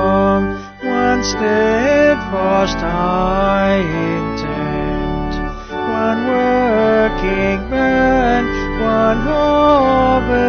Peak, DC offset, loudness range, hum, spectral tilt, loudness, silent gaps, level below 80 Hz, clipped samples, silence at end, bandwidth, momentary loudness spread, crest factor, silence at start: -2 dBFS; under 0.1%; 4 LU; none; -6 dB/octave; -15 LUFS; none; -28 dBFS; under 0.1%; 0 s; 6.6 kHz; 8 LU; 12 dB; 0 s